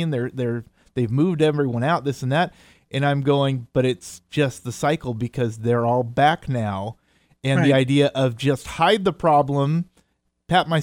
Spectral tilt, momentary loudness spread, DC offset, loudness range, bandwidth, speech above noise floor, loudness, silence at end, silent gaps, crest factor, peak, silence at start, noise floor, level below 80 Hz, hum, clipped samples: -6.5 dB/octave; 9 LU; under 0.1%; 3 LU; 16 kHz; 46 dB; -21 LUFS; 0 s; none; 16 dB; -4 dBFS; 0 s; -67 dBFS; -52 dBFS; none; under 0.1%